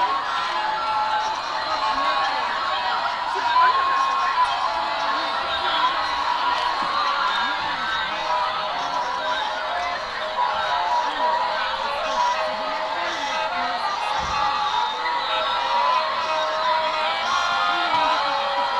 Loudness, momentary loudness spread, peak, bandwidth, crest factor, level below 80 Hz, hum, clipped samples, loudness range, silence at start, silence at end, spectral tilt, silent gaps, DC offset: -22 LUFS; 5 LU; -6 dBFS; 11.5 kHz; 16 dB; -54 dBFS; none; under 0.1%; 3 LU; 0 s; 0 s; -1.5 dB/octave; none; under 0.1%